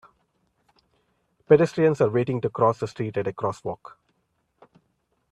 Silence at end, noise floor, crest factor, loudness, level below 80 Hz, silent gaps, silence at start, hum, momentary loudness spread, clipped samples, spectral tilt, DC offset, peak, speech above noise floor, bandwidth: 1.55 s; -72 dBFS; 24 dB; -23 LUFS; -64 dBFS; none; 1.5 s; none; 13 LU; under 0.1%; -8 dB/octave; under 0.1%; -2 dBFS; 50 dB; 9.4 kHz